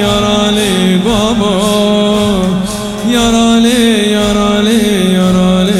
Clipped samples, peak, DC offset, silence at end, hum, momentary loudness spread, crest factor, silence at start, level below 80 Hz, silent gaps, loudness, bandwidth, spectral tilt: 0.1%; 0 dBFS; under 0.1%; 0 s; none; 4 LU; 10 dB; 0 s; -30 dBFS; none; -10 LUFS; 15 kHz; -5 dB/octave